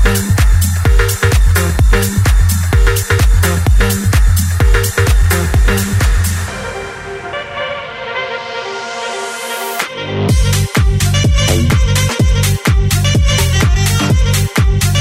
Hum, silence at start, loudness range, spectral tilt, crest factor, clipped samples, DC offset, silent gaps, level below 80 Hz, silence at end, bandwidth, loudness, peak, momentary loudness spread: none; 0 s; 7 LU; -4.5 dB/octave; 10 dB; under 0.1%; under 0.1%; none; -14 dBFS; 0 s; 16.5 kHz; -13 LUFS; -2 dBFS; 9 LU